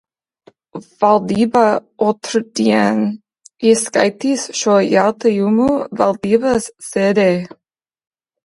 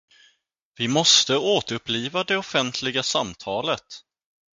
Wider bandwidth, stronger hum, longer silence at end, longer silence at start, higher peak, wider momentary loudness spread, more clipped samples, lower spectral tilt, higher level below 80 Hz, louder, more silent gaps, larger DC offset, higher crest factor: first, 11.5 kHz vs 10 kHz; neither; first, 1 s vs 0.6 s; about the same, 0.75 s vs 0.8 s; about the same, 0 dBFS vs -2 dBFS; second, 9 LU vs 13 LU; neither; first, -5 dB/octave vs -2.5 dB/octave; first, -54 dBFS vs -62 dBFS; first, -15 LUFS vs -22 LUFS; neither; neither; second, 16 dB vs 22 dB